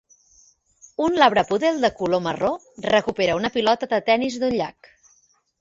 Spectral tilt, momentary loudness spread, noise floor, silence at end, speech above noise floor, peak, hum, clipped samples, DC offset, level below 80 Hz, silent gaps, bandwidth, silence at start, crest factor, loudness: -4.5 dB/octave; 9 LU; -61 dBFS; 0.9 s; 41 dB; -2 dBFS; none; under 0.1%; under 0.1%; -56 dBFS; none; 7.8 kHz; 1 s; 20 dB; -21 LUFS